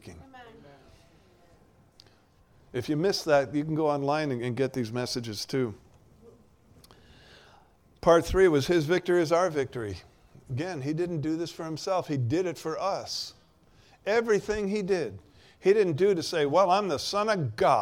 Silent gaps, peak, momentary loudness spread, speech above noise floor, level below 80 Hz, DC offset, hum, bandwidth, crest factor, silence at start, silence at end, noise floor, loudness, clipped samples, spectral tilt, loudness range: none; -8 dBFS; 12 LU; 34 dB; -52 dBFS; under 0.1%; none; 16.5 kHz; 20 dB; 0.05 s; 0 s; -61 dBFS; -27 LUFS; under 0.1%; -5.5 dB/octave; 6 LU